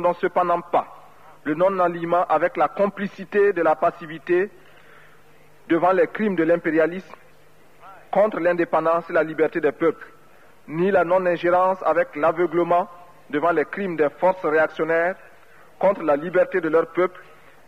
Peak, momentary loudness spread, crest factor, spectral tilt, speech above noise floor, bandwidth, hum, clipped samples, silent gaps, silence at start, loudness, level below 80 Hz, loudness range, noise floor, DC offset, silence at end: -8 dBFS; 6 LU; 14 dB; -7.5 dB/octave; 34 dB; 9 kHz; none; under 0.1%; none; 0 s; -21 LUFS; -66 dBFS; 2 LU; -54 dBFS; 0.3%; 0.45 s